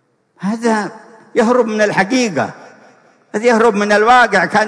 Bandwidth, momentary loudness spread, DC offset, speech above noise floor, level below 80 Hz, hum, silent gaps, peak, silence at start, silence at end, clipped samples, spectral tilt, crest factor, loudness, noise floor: 10.5 kHz; 13 LU; under 0.1%; 35 dB; -54 dBFS; none; none; -2 dBFS; 0.4 s; 0 s; under 0.1%; -4.5 dB/octave; 12 dB; -13 LUFS; -48 dBFS